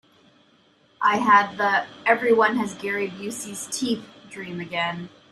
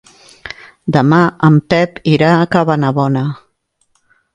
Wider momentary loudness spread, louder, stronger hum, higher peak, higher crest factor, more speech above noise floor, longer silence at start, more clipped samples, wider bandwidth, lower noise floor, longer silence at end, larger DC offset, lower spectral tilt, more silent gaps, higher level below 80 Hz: second, 16 LU vs 20 LU; second, -22 LUFS vs -12 LUFS; neither; second, -4 dBFS vs 0 dBFS; first, 20 dB vs 14 dB; second, 36 dB vs 50 dB; first, 1 s vs 0.45 s; neither; first, 14 kHz vs 9 kHz; about the same, -59 dBFS vs -61 dBFS; second, 0.25 s vs 1 s; neither; second, -3.5 dB/octave vs -8 dB/octave; neither; second, -68 dBFS vs -50 dBFS